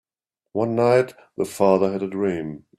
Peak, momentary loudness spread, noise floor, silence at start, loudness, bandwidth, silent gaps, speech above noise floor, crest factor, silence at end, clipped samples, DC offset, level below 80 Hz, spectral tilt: -4 dBFS; 11 LU; -85 dBFS; 0.55 s; -22 LUFS; 14.5 kHz; none; 64 dB; 18 dB; 0.2 s; under 0.1%; under 0.1%; -62 dBFS; -7 dB/octave